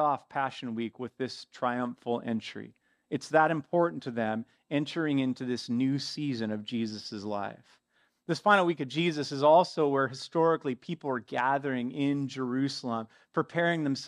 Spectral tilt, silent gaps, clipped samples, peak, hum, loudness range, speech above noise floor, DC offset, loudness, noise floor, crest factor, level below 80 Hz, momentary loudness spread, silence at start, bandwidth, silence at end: -6 dB/octave; none; under 0.1%; -8 dBFS; none; 6 LU; 42 dB; under 0.1%; -30 LUFS; -72 dBFS; 22 dB; -80 dBFS; 12 LU; 0 s; 11 kHz; 0 s